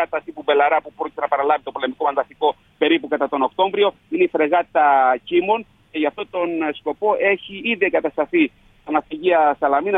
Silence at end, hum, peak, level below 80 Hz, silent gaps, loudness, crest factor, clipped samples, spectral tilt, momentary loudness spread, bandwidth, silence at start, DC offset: 0 s; none; -4 dBFS; -60 dBFS; none; -20 LUFS; 16 dB; under 0.1%; -7 dB/octave; 7 LU; 4 kHz; 0 s; under 0.1%